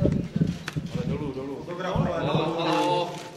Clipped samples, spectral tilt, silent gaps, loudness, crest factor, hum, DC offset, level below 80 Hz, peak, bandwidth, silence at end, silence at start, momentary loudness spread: under 0.1%; -6.5 dB/octave; none; -27 LUFS; 20 dB; none; under 0.1%; -44 dBFS; -8 dBFS; 13 kHz; 0 s; 0 s; 9 LU